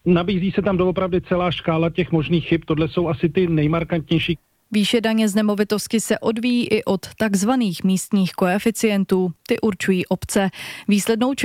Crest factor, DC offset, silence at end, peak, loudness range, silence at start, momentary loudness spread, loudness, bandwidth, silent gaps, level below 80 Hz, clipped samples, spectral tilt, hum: 14 dB; under 0.1%; 0 s; -6 dBFS; 1 LU; 0.05 s; 3 LU; -20 LUFS; 16 kHz; none; -46 dBFS; under 0.1%; -5.5 dB/octave; none